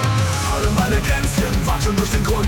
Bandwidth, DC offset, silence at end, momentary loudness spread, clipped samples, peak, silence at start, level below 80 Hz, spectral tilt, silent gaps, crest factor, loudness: 18 kHz; under 0.1%; 0 s; 1 LU; under 0.1%; -6 dBFS; 0 s; -24 dBFS; -5 dB/octave; none; 12 dB; -19 LUFS